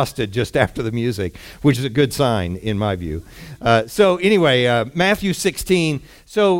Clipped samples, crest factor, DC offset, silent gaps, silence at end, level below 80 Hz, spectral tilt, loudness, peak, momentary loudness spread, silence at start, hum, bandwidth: under 0.1%; 16 dB; under 0.1%; none; 0 s; -42 dBFS; -5.5 dB/octave; -18 LUFS; -2 dBFS; 11 LU; 0 s; none; 17 kHz